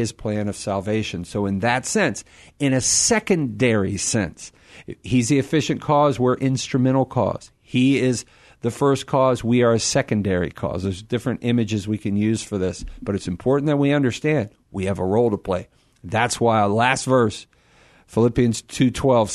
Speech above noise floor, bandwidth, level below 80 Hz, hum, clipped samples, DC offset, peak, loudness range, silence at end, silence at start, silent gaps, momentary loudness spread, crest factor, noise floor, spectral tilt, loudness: 33 dB; 12.5 kHz; -48 dBFS; none; under 0.1%; under 0.1%; -4 dBFS; 2 LU; 0 s; 0 s; none; 10 LU; 18 dB; -54 dBFS; -5 dB/octave; -21 LUFS